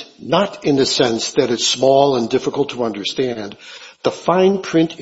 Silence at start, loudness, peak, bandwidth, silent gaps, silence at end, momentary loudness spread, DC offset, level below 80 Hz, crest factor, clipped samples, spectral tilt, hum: 0 s; -17 LUFS; 0 dBFS; 8 kHz; none; 0 s; 10 LU; under 0.1%; -56 dBFS; 16 dB; under 0.1%; -4 dB/octave; none